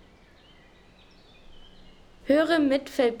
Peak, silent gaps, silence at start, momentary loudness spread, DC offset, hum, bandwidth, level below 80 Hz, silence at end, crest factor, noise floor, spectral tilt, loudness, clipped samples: -10 dBFS; none; 1.5 s; 6 LU; under 0.1%; none; 18.5 kHz; -56 dBFS; 0 s; 18 dB; -55 dBFS; -4.5 dB/octave; -24 LUFS; under 0.1%